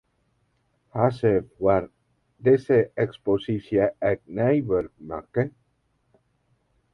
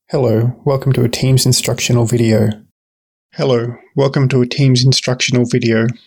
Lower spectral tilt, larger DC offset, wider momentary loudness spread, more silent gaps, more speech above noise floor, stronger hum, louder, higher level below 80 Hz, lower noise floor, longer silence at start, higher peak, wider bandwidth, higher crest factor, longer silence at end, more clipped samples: first, -9.5 dB/octave vs -5.5 dB/octave; neither; first, 9 LU vs 6 LU; second, none vs 2.71-3.29 s; second, 47 dB vs over 77 dB; neither; second, -24 LUFS vs -14 LUFS; second, -54 dBFS vs -44 dBFS; second, -70 dBFS vs under -90 dBFS; first, 0.95 s vs 0.1 s; second, -6 dBFS vs -2 dBFS; second, 6.2 kHz vs 19 kHz; first, 20 dB vs 12 dB; first, 1.45 s vs 0.15 s; neither